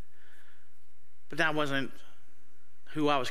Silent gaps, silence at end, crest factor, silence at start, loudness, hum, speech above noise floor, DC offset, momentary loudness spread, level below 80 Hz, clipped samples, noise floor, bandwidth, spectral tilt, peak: none; 0 s; 24 dB; 1.3 s; -32 LUFS; none; 39 dB; 3%; 14 LU; -68 dBFS; under 0.1%; -69 dBFS; 15.5 kHz; -5 dB/octave; -12 dBFS